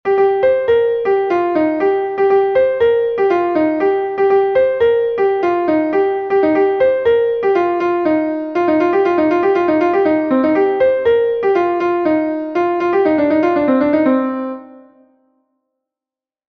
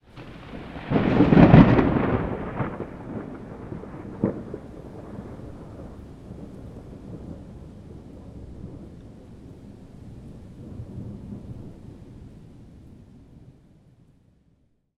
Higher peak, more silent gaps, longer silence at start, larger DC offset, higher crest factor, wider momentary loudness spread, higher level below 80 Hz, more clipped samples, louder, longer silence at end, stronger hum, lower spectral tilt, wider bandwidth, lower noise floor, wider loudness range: about the same, -2 dBFS vs 0 dBFS; neither; about the same, 0.05 s vs 0.15 s; neither; second, 12 dB vs 26 dB; second, 3 LU vs 27 LU; second, -52 dBFS vs -40 dBFS; neither; first, -15 LUFS vs -20 LUFS; second, 1.7 s vs 2.7 s; neither; second, -7.5 dB/octave vs -9.5 dB/octave; about the same, 6.2 kHz vs 6 kHz; first, -90 dBFS vs -65 dBFS; second, 2 LU vs 23 LU